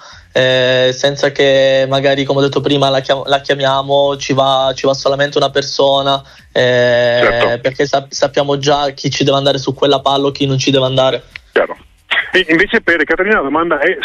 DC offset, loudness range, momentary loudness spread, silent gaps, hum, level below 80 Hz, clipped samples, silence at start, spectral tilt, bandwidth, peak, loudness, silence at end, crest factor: under 0.1%; 1 LU; 5 LU; none; none; -44 dBFS; under 0.1%; 0 s; -4.5 dB/octave; 9.4 kHz; 0 dBFS; -13 LUFS; 0 s; 12 dB